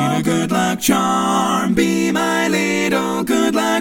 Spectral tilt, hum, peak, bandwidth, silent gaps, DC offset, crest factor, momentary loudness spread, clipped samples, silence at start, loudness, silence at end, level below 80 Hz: -4.5 dB/octave; none; -2 dBFS; 17 kHz; none; under 0.1%; 14 dB; 2 LU; under 0.1%; 0 s; -17 LUFS; 0 s; -48 dBFS